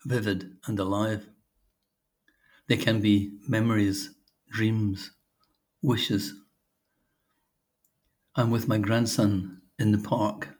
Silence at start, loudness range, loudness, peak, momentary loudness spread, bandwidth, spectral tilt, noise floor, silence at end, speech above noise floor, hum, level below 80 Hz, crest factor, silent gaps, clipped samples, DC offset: 0.05 s; 5 LU; -27 LUFS; -8 dBFS; 11 LU; over 20 kHz; -6 dB/octave; -80 dBFS; 0.05 s; 54 dB; none; -68 dBFS; 20 dB; none; under 0.1%; under 0.1%